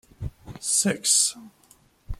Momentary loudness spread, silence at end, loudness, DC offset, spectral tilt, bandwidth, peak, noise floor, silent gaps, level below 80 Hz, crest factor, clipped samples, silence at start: 19 LU; 0.05 s; -21 LUFS; under 0.1%; -1.5 dB/octave; 16 kHz; -8 dBFS; -58 dBFS; none; -44 dBFS; 20 dB; under 0.1%; 0.2 s